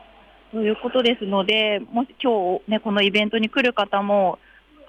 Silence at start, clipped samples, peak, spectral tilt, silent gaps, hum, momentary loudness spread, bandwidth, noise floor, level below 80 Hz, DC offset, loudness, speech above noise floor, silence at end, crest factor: 0.55 s; under 0.1%; -8 dBFS; -6 dB/octave; none; none; 6 LU; 9 kHz; -50 dBFS; -60 dBFS; under 0.1%; -21 LUFS; 29 dB; 0.55 s; 14 dB